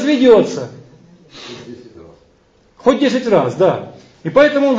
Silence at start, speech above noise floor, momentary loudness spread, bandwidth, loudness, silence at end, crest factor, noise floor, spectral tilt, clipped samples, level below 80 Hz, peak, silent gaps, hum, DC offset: 0 s; 41 dB; 23 LU; 7.8 kHz; -14 LUFS; 0 s; 16 dB; -53 dBFS; -6 dB/octave; under 0.1%; -54 dBFS; 0 dBFS; none; none; under 0.1%